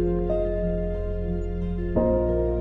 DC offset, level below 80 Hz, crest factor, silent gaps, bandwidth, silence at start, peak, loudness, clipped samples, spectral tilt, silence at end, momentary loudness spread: under 0.1%; -30 dBFS; 14 dB; none; 3.9 kHz; 0 s; -10 dBFS; -26 LUFS; under 0.1%; -11 dB/octave; 0 s; 7 LU